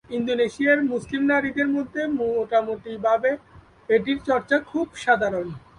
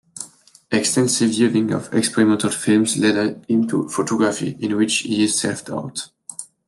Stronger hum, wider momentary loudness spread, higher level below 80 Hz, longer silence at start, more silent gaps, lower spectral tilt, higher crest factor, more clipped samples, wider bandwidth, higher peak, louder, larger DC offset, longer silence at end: neither; second, 6 LU vs 13 LU; first, -56 dBFS vs -64 dBFS; about the same, 0.1 s vs 0.15 s; neither; first, -5.5 dB/octave vs -4 dB/octave; about the same, 16 dB vs 16 dB; neither; second, 10.5 kHz vs 12.5 kHz; about the same, -6 dBFS vs -4 dBFS; second, -23 LUFS vs -19 LUFS; neither; about the same, 0.2 s vs 0.25 s